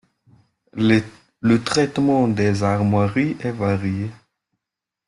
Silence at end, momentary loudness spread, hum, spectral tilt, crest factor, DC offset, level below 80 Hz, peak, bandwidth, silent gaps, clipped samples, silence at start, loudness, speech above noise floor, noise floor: 0.9 s; 9 LU; none; -6.5 dB/octave; 18 dB; under 0.1%; -54 dBFS; -2 dBFS; 11.5 kHz; none; under 0.1%; 0.75 s; -20 LUFS; 67 dB; -85 dBFS